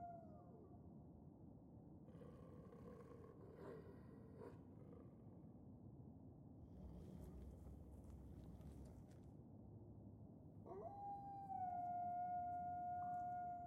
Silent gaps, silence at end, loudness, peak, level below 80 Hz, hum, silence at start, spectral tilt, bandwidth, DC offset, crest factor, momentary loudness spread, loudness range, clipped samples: none; 0 s; -55 LUFS; -40 dBFS; -68 dBFS; none; 0 s; -9 dB/octave; 13 kHz; under 0.1%; 14 dB; 15 LU; 11 LU; under 0.1%